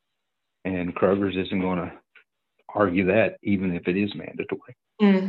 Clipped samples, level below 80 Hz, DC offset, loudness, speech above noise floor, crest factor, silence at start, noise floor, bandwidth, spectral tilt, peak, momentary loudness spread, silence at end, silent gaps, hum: under 0.1%; -52 dBFS; under 0.1%; -25 LUFS; 59 dB; 18 dB; 0.65 s; -82 dBFS; 5.2 kHz; -9.5 dB/octave; -6 dBFS; 12 LU; 0 s; none; none